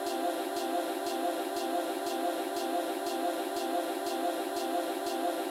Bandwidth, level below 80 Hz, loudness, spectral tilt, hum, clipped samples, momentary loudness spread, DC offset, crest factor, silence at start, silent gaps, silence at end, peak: 16.5 kHz; -78 dBFS; -33 LUFS; -2 dB/octave; none; under 0.1%; 1 LU; under 0.1%; 12 dB; 0 s; none; 0 s; -20 dBFS